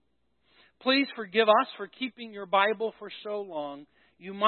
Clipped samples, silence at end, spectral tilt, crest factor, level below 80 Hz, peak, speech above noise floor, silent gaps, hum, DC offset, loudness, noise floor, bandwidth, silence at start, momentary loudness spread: under 0.1%; 0 s; -8 dB/octave; 22 dB; -80 dBFS; -8 dBFS; 46 dB; none; none; under 0.1%; -28 LUFS; -74 dBFS; 4.5 kHz; 0.85 s; 18 LU